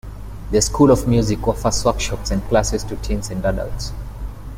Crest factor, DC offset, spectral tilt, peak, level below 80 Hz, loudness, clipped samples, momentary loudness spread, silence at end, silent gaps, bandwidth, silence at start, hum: 16 dB; under 0.1%; -5 dB/octave; -2 dBFS; -28 dBFS; -19 LUFS; under 0.1%; 17 LU; 0 s; none; 16.5 kHz; 0.05 s; none